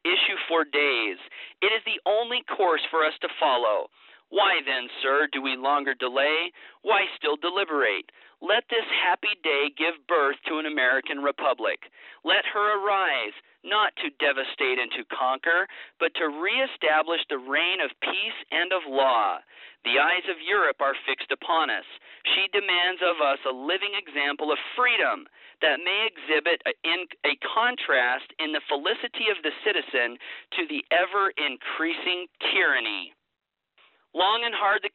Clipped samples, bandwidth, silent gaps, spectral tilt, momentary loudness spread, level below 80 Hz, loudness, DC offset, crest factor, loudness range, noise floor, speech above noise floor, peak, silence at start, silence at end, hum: under 0.1%; 4.5 kHz; none; 3.5 dB/octave; 7 LU; -78 dBFS; -25 LUFS; under 0.1%; 16 dB; 1 LU; -63 dBFS; 38 dB; -10 dBFS; 0.05 s; 0.05 s; none